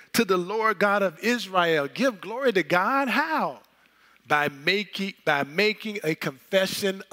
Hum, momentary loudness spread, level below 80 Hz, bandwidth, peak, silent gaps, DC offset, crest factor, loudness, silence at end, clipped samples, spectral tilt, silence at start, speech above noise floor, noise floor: none; 6 LU; -74 dBFS; 16 kHz; -6 dBFS; none; under 0.1%; 20 dB; -24 LUFS; 0.1 s; under 0.1%; -4 dB/octave; 0.15 s; 35 dB; -59 dBFS